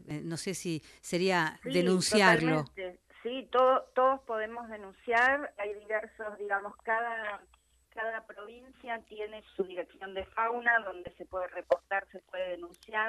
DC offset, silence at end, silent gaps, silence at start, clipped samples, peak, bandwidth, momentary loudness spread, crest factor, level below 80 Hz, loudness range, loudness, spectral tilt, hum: under 0.1%; 0 s; none; 0 s; under 0.1%; -10 dBFS; 13 kHz; 17 LU; 22 dB; -66 dBFS; 10 LU; -31 LUFS; -4.5 dB/octave; none